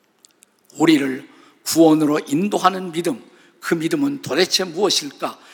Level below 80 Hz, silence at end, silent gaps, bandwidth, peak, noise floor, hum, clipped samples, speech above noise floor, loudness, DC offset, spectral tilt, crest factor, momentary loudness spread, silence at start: -74 dBFS; 0.2 s; none; 19 kHz; 0 dBFS; -55 dBFS; none; under 0.1%; 36 dB; -19 LUFS; under 0.1%; -4 dB/octave; 20 dB; 14 LU; 0.75 s